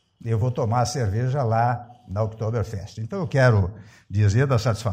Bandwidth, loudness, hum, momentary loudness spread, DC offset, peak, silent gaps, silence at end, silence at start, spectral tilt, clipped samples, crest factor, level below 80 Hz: 9.8 kHz; -23 LUFS; none; 12 LU; under 0.1%; -6 dBFS; none; 0 s; 0.25 s; -6.5 dB/octave; under 0.1%; 16 dB; -50 dBFS